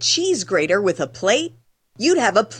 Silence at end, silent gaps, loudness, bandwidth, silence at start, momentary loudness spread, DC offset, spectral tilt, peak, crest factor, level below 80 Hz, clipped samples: 0 s; none; -19 LUFS; 10 kHz; 0 s; 6 LU; under 0.1%; -2.5 dB/octave; -4 dBFS; 16 dB; -62 dBFS; under 0.1%